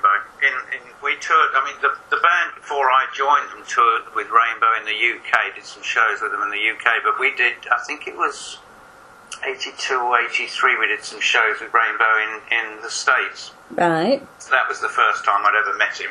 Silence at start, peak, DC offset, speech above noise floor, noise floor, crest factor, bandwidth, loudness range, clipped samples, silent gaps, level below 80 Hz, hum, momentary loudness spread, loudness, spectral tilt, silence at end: 0.05 s; 0 dBFS; under 0.1%; 25 dB; -45 dBFS; 20 dB; 11.5 kHz; 3 LU; under 0.1%; none; -68 dBFS; none; 9 LU; -19 LUFS; -2 dB/octave; 0 s